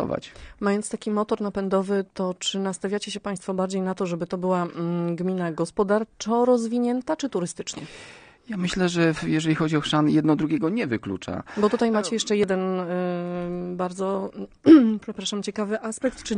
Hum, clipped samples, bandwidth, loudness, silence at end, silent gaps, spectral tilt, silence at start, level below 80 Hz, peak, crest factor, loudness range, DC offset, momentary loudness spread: none; under 0.1%; 10 kHz; -24 LUFS; 0 s; none; -5.5 dB/octave; 0 s; -56 dBFS; -2 dBFS; 22 dB; 5 LU; under 0.1%; 9 LU